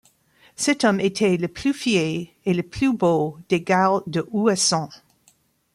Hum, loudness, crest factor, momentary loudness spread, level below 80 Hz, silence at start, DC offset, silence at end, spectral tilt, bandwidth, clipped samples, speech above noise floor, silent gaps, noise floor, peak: none; -21 LUFS; 18 dB; 7 LU; -56 dBFS; 0.6 s; under 0.1%; 0.8 s; -4.5 dB/octave; 14.5 kHz; under 0.1%; 40 dB; none; -61 dBFS; -4 dBFS